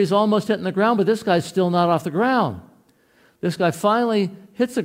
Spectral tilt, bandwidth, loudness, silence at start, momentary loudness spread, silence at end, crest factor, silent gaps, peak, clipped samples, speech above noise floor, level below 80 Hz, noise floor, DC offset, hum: -6.5 dB/octave; 16 kHz; -20 LUFS; 0 s; 8 LU; 0 s; 16 dB; none; -4 dBFS; under 0.1%; 38 dB; -64 dBFS; -58 dBFS; under 0.1%; none